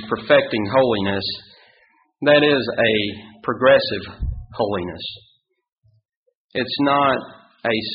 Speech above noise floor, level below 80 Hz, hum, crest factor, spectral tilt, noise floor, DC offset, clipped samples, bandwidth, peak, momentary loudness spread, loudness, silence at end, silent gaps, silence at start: 39 dB; -42 dBFS; none; 18 dB; -3 dB/octave; -58 dBFS; under 0.1%; under 0.1%; 5.4 kHz; -2 dBFS; 14 LU; -19 LUFS; 0 s; 5.72-5.82 s, 6.05-6.09 s, 6.16-6.26 s, 6.35-6.49 s; 0 s